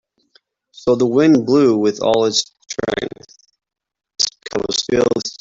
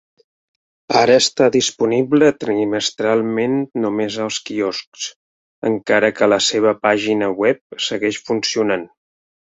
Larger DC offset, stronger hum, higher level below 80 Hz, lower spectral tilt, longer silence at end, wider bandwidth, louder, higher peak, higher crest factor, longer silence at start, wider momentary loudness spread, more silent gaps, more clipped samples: neither; neither; first, -52 dBFS vs -60 dBFS; about the same, -4 dB/octave vs -3.5 dB/octave; second, 0.05 s vs 0.7 s; about the same, 8 kHz vs 8.2 kHz; about the same, -17 LUFS vs -17 LUFS; about the same, -2 dBFS vs -2 dBFS; about the same, 16 dB vs 16 dB; about the same, 0.85 s vs 0.9 s; first, 12 LU vs 9 LU; second, none vs 4.87-4.92 s, 5.16-5.62 s, 7.61-7.70 s; neither